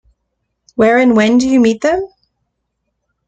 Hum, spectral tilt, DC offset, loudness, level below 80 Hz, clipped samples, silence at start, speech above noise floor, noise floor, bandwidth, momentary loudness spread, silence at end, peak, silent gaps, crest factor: none; -5.5 dB/octave; under 0.1%; -12 LUFS; -48 dBFS; under 0.1%; 0.8 s; 60 dB; -71 dBFS; 8.6 kHz; 13 LU; 1.2 s; -2 dBFS; none; 14 dB